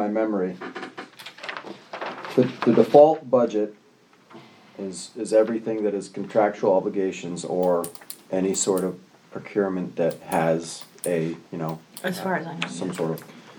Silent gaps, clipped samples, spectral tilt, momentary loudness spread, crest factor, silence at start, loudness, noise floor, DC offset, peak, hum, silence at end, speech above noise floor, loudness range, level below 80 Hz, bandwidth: none; under 0.1%; -5 dB/octave; 15 LU; 24 dB; 0 s; -24 LUFS; -56 dBFS; under 0.1%; 0 dBFS; none; 0 s; 33 dB; 6 LU; -74 dBFS; over 20 kHz